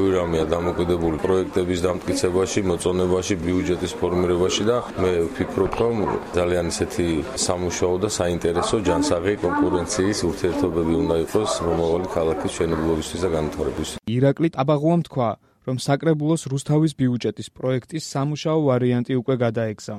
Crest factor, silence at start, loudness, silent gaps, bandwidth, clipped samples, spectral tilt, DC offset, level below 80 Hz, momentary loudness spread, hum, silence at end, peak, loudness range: 16 dB; 0 s; -22 LUFS; none; 15 kHz; under 0.1%; -5.5 dB/octave; under 0.1%; -42 dBFS; 5 LU; none; 0 s; -6 dBFS; 1 LU